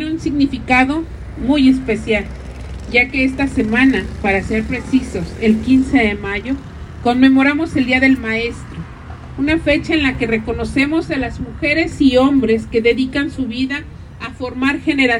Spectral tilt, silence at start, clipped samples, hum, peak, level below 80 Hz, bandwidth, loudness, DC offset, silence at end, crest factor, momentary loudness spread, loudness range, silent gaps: -6 dB/octave; 0 s; under 0.1%; none; 0 dBFS; -34 dBFS; 11 kHz; -16 LUFS; under 0.1%; 0 s; 16 dB; 14 LU; 2 LU; none